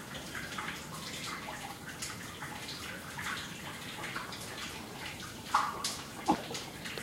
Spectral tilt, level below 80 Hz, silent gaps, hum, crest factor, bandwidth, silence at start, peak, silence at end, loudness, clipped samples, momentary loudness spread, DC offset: -2.5 dB/octave; -62 dBFS; none; none; 26 dB; 16 kHz; 0 s; -12 dBFS; 0 s; -38 LUFS; under 0.1%; 8 LU; under 0.1%